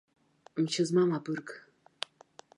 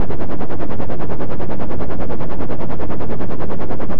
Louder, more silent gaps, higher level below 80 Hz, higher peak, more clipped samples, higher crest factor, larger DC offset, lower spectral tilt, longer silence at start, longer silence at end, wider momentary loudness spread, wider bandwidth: second, -32 LUFS vs -26 LUFS; neither; second, -82 dBFS vs -32 dBFS; second, -10 dBFS vs -2 dBFS; neither; about the same, 22 dB vs 18 dB; second, under 0.1% vs 50%; second, -5.5 dB/octave vs -9.5 dB/octave; first, 0.55 s vs 0 s; first, 1 s vs 0 s; first, 16 LU vs 0 LU; first, 11.5 kHz vs 7.2 kHz